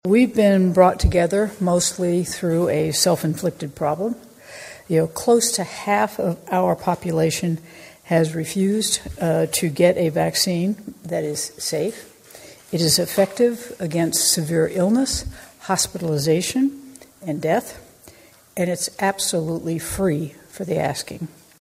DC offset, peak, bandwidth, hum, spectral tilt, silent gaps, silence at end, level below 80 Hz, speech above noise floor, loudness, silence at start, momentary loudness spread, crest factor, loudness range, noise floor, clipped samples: under 0.1%; 0 dBFS; 16 kHz; none; -4.5 dB/octave; none; 0.4 s; -40 dBFS; 28 dB; -20 LUFS; 0.05 s; 12 LU; 20 dB; 4 LU; -48 dBFS; under 0.1%